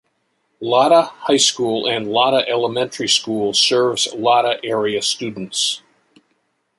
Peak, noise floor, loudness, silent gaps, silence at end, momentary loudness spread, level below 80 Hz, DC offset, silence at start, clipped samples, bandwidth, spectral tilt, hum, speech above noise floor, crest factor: -2 dBFS; -67 dBFS; -17 LUFS; none; 1 s; 7 LU; -64 dBFS; under 0.1%; 0.6 s; under 0.1%; 11.5 kHz; -2.5 dB/octave; none; 50 dB; 18 dB